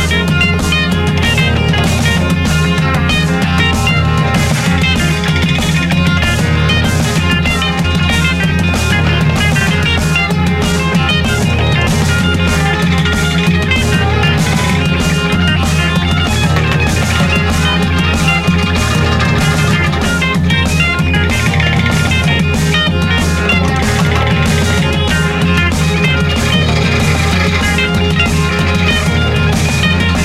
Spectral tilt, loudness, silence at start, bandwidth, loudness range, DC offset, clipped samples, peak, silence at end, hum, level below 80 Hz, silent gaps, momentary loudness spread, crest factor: -5 dB/octave; -12 LUFS; 0 s; 15.5 kHz; 0 LU; under 0.1%; under 0.1%; -2 dBFS; 0 s; none; -22 dBFS; none; 1 LU; 10 dB